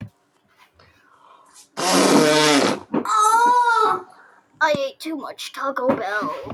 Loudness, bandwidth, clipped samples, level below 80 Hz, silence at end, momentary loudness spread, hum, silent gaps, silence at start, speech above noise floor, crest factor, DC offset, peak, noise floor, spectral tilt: -18 LUFS; 15.5 kHz; under 0.1%; -66 dBFS; 0 s; 14 LU; none; none; 0 s; 37 dB; 18 dB; under 0.1%; -2 dBFS; -61 dBFS; -3 dB/octave